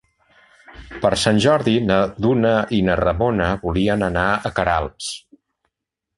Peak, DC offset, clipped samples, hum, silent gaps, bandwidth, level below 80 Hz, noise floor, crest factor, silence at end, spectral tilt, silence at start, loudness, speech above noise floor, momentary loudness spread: 0 dBFS; under 0.1%; under 0.1%; none; none; 11.5 kHz; -38 dBFS; -81 dBFS; 18 dB; 1 s; -5.5 dB/octave; 0.7 s; -19 LUFS; 63 dB; 9 LU